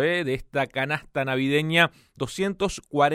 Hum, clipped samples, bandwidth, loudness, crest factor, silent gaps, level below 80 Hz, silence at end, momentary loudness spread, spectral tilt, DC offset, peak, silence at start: none; under 0.1%; 16 kHz; -25 LUFS; 20 dB; none; -50 dBFS; 0 s; 7 LU; -5 dB/octave; under 0.1%; -4 dBFS; 0 s